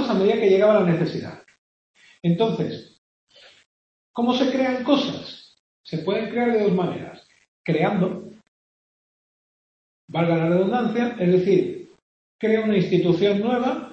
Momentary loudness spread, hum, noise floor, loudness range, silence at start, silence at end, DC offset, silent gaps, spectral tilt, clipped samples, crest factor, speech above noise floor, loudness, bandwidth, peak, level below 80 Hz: 16 LU; none; under -90 dBFS; 6 LU; 0 s; 0 s; under 0.1%; 1.58-1.94 s, 2.98-3.27 s, 3.66-4.14 s, 5.59-5.84 s, 7.48-7.64 s, 8.48-10.08 s, 12.02-12.39 s; -7.5 dB/octave; under 0.1%; 20 dB; over 69 dB; -21 LUFS; 7.2 kHz; -4 dBFS; -66 dBFS